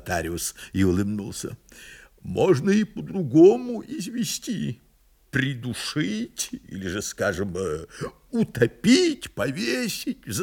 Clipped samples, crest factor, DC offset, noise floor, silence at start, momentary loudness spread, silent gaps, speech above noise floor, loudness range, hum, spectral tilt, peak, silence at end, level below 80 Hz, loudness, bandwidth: under 0.1%; 20 dB; under 0.1%; -52 dBFS; 0.05 s; 15 LU; none; 28 dB; 6 LU; none; -5 dB/octave; -4 dBFS; 0 s; -54 dBFS; -24 LUFS; 18 kHz